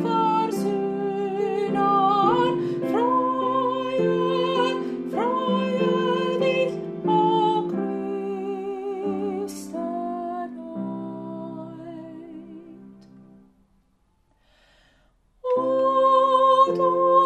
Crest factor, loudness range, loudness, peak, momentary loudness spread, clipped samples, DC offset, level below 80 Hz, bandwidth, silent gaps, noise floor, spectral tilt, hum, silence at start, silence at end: 18 dB; 15 LU; -23 LUFS; -6 dBFS; 16 LU; under 0.1%; under 0.1%; -66 dBFS; 14 kHz; none; -65 dBFS; -6.5 dB/octave; none; 0 s; 0 s